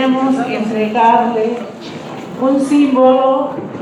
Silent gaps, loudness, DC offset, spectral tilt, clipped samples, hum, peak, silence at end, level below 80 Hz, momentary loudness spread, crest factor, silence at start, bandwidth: none; -13 LUFS; under 0.1%; -6 dB/octave; under 0.1%; none; 0 dBFS; 0 s; -60 dBFS; 17 LU; 14 dB; 0 s; 11.5 kHz